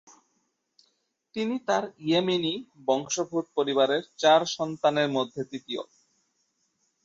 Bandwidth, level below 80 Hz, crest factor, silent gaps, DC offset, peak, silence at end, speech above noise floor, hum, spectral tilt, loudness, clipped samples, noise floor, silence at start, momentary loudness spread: 7.8 kHz; -74 dBFS; 20 dB; none; under 0.1%; -8 dBFS; 1.2 s; 49 dB; none; -4 dB/octave; -27 LUFS; under 0.1%; -75 dBFS; 1.35 s; 13 LU